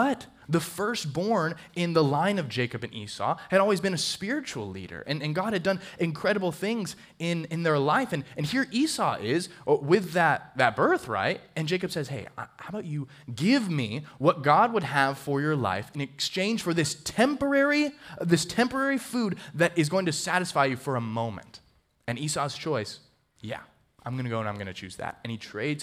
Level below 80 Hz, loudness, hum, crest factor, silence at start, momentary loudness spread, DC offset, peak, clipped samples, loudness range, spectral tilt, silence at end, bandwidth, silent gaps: -64 dBFS; -27 LUFS; none; 22 dB; 0 s; 13 LU; under 0.1%; -6 dBFS; under 0.1%; 5 LU; -5 dB/octave; 0 s; 16 kHz; none